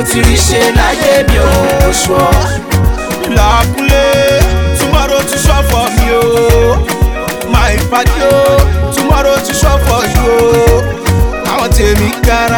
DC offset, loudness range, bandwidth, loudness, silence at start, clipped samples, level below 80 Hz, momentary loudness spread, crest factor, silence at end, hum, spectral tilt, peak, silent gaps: 0.6%; 1 LU; over 20 kHz; -10 LUFS; 0 s; 0.2%; -14 dBFS; 4 LU; 8 dB; 0 s; none; -4.5 dB/octave; 0 dBFS; none